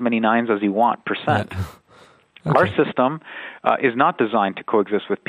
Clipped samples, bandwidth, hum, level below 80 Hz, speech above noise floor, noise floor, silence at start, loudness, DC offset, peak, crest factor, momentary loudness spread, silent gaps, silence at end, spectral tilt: under 0.1%; 14.5 kHz; none; -54 dBFS; 31 dB; -51 dBFS; 0 s; -20 LUFS; under 0.1%; 0 dBFS; 20 dB; 12 LU; none; 0.15 s; -7.5 dB/octave